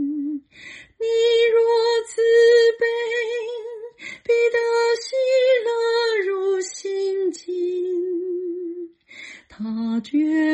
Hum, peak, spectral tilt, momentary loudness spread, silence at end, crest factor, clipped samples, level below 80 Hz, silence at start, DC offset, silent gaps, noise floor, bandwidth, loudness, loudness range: none; -8 dBFS; -3 dB/octave; 19 LU; 0 s; 14 dB; under 0.1%; -68 dBFS; 0 s; under 0.1%; none; -43 dBFS; 9.6 kHz; -20 LUFS; 8 LU